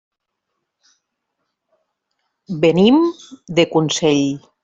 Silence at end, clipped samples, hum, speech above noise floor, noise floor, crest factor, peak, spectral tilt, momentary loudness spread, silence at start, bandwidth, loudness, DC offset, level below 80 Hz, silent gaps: 0.25 s; under 0.1%; none; 61 dB; -77 dBFS; 16 dB; -2 dBFS; -5 dB/octave; 10 LU; 2.5 s; 8 kHz; -16 LUFS; under 0.1%; -58 dBFS; none